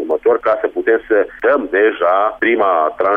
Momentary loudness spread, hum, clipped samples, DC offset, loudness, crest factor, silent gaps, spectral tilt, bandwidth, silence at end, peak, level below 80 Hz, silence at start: 3 LU; none; under 0.1%; under 0.1%; -15 LUFS; 10 dB; none; -6.5 dB/octave; 3.9 kHz; 0 s; -4 dBFS; -52 dBFS; 0 s